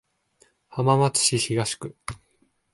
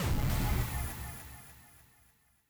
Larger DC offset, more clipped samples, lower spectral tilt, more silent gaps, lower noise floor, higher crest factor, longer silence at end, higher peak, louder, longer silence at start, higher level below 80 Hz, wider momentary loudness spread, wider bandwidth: neither; neither; about the same, -4 dB/octave vs -5 dB/octave; neither; about the same, -67 dBFS vs -67 dBFS; about the same, 20 dB vs 16 dB; second, 0.6 s vs 0.85 s; first, -6 dBFS vs -20 dBFS; first, -22 LUFS vs -35 LUFS; first, 0.7 s vs 0 s; second, -58 dBFS vs -38 dBFS; second, 18 LU vs 22 LU; second, 12 kHz vs over 20 kHz